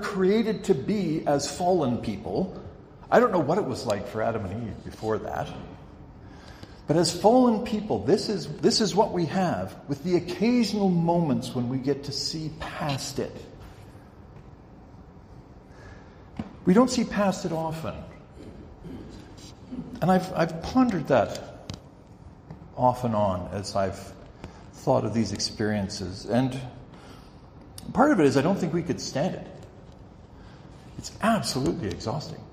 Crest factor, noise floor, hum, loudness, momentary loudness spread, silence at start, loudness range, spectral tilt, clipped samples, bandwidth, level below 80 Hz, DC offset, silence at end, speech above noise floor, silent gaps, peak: 22 dB; -48 dBFS; none; -26 LUFS; 23 LU; 0 s; 7 LU; -5.5 dB/octave; under 0.1%; 15.5 kHz; -52 dBFS; under 0.1%; 0 s; 23 dB; none; -6 dBFS